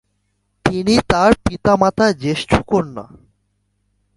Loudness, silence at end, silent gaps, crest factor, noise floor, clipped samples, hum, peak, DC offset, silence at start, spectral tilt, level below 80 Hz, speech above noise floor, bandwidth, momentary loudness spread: -16 LUFS; 1.15 s; none; 18 dB; -67 dBFS; under 0.1%; 50 Hz at -40 dBFS; 0 dBFS; under 0.1%; 0.65 s; -5.5 dB/octave; -36 dBFS; 52 dB; 11.5 kHz; 8 LU